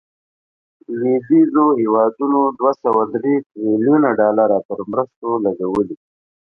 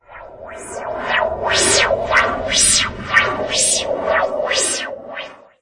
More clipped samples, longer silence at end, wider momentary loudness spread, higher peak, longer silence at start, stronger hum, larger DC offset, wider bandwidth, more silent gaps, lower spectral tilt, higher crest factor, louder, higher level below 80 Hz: neither; first, 0.6 s vs 0.25 s; second, 8 LU vs 18 LU; about the same, -2 dBFS vs 0 dBFS; first, 0.9 s vs 0.1 s; neither; neither; second, 5.6 kHz vs 11.5 kHz; first, 3.46-3.50 s, 4.65-4.69 s, 5.16-5.22 s vs none; first, -10.5 dB/octave vs -0.5 dB/octave; about the same, 16 dB vs 18 dB; about the same, -17 LUFS vs -15 LUFS; second, -60 dBFS vs -42 dBFS